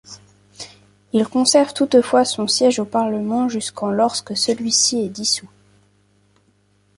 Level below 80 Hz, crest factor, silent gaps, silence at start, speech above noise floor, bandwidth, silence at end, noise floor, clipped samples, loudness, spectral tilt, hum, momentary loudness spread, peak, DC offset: -62 dBFS; 18 dB; none; 0.1 s; 42 dB; 11.5 kHz; 1.5 s; -60 dBFS; under 0.1%; -18 LUFS; -3 dB/octave; 50 Hz at -45 dBFS; 8 LU; -2 dBFS; under 0.1%